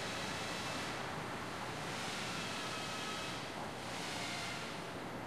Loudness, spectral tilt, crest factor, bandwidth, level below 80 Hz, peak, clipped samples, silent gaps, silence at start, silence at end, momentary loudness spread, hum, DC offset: -41 LUFS; -3 dB/octave; 14 dB; 13 kHz; -66 dBFS; -28 dBFS; under 0.1%; none; 0 s; 0 s; 3 LU; none; 0.1%